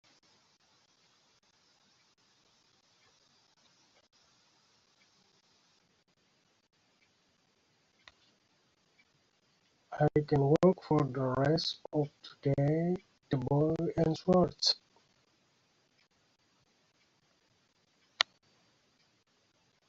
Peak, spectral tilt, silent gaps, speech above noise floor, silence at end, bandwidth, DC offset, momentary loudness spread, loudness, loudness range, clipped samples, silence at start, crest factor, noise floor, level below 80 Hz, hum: -4 dBFS; -5.5 dB/octave; none; 43 dB; 1.65 s; 7.8 kHz; under 0.1%; 9 LU; -31 LUFS; 11 LU; under 0.1%; 9.9 s; 32 dB; -73 dBFS; -64 dBFS; none